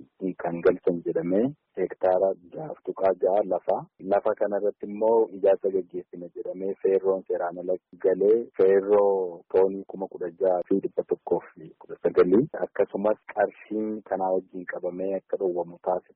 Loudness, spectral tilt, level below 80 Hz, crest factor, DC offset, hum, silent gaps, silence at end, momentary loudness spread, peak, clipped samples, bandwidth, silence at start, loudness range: -26 LUFS; -7.5 dB/octave; -68 dBFS; 14 dB; under 0.1%; none; none; 0.15 s; 12 LU; -10 dBFS; under 0.1%; 4.3 kHz; 0.2 s; 3 LU